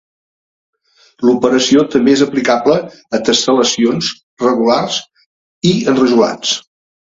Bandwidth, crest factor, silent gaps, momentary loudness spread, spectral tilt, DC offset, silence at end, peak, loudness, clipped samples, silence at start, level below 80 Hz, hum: 7.8 kHz; 14 dB; 4.23-4.37 s, 5.26-5.61 s; 8 LU; -4 dB/octave; under 0.1%; 0.45 s; 0 dBFS; -13 LUFS; under 0.1%; 1.2 s; -52 dBFS; none